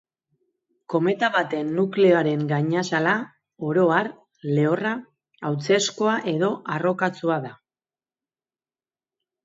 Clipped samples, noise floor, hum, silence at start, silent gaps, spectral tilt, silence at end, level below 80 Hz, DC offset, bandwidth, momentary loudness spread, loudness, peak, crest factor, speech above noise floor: under 0.1%; under -90 dBFS; none; 0.9 s; none; -5.5 dB/octave; 1.9 s; -72 dBFS; under 0.1%; 8 kHz; 11 LU; -23 LUFS; -4 dBFS; 20 dB; over 68 dB